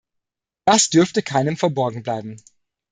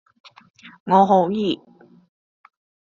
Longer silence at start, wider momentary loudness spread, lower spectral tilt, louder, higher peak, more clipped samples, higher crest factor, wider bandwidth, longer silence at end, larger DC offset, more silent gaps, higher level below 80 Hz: about the same, 0.65 s vs 0.65 s; about the same, 13 LU vs 15 LU; second, -4 dB/octave vs -5.5 dB/octave; about the same, -19 LUFS vs -18 LUFS; about the same, -2 dBFS vs -4 dBFS; neither; about the same, 20 dB vs 20 dB; first, 9.8 kHz vs 7.2 kHz; second, 0.55 s vs 1.4 s; neither; second, none vs 0.80-0.86 s; about the same, -62 dBFS vs -66 dBFS